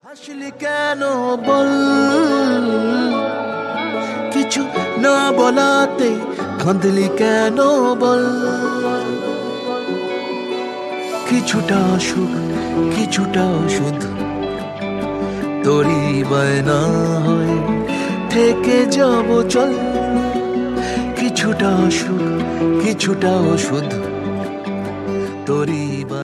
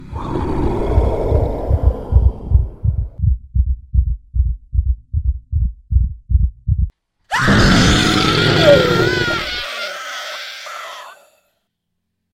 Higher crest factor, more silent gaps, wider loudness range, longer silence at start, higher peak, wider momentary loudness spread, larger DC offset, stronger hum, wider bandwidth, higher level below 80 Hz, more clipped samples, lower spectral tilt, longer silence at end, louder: about the same, 16 dB vs 16 dB; neither; second, 4 LU vs 7 LU; about the same, 0.05 s vs 0 s; about the same, -2 dBFS vs 0 dBFS; second, 9 LU vs 14 LU; neither; neither; second, 13 kHz vs 14.5 kHz; second, -46 dBFS vs -20 dBFS; neither; about the same, -5.5 dB/octave vs -5.5 dB/octave; second, 0 s vs 1.2 s; about the same, -17 LUFS vs -17 LUFS